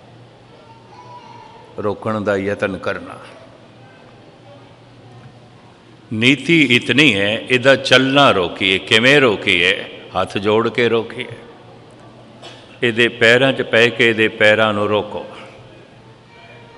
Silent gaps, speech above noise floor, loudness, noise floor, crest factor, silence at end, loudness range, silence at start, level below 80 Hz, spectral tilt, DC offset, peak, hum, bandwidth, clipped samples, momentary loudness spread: none; 29 dB; -14 LUFS; -44 dBFS; 18 dB; 1.15 s; 12 LU; 1 s; -58 dBFS; -4.5 dB/octave; under 0.1%; 0 dBFS; none; 11.5 kHz; 0.1%; 17 LU